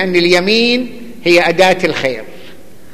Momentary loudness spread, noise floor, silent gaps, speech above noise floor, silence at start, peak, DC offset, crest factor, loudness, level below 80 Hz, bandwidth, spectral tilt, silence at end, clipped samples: 9 LU; -39 dBFS; none; 27 dB; 0 s; 0 dBFS; 3%; 14 dB; -12 LUFS; -52 dBFS; 15 kHz; -4.5 dB/octave; 0.4 s; under 0.1%